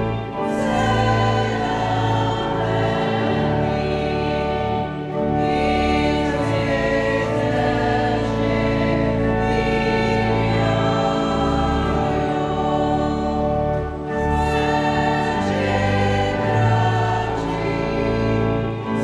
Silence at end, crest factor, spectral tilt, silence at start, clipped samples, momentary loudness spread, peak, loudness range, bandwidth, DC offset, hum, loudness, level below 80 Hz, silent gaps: 0 s; 14 dB; -7 dB/octave; 0 s; under 0.1%; 4 LU; -6 dBFS; 1 LU; 10.5 kHz; under 0.1%; none; -20 LUFS; -34 dBFS; none